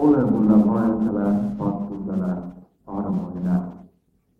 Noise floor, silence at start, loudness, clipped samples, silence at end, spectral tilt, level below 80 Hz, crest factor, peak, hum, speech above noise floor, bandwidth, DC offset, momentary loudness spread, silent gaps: -64 dBFS; 0 s; -22 LUFS; under 0.1%; 0.55 s; -11 dB/octave; -50 dBFS; 16 dB; -6 dBFS; none; 44 dB; 3.3 kHz; under 0.1%; 14 LU; none